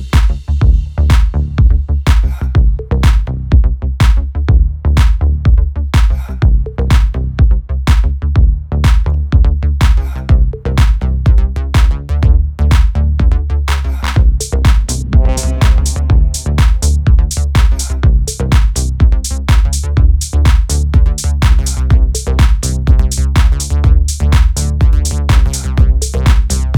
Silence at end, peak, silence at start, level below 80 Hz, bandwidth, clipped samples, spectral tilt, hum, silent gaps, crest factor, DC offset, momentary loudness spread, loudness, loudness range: 0 s; 0 dBFS; 0 s; -10 dBFS; 13 kHz; under 0.1%; -5.5 dB/octave; none; none; 10 dB; under 0.1%; 3 LU; -13 LUFS; 1 LU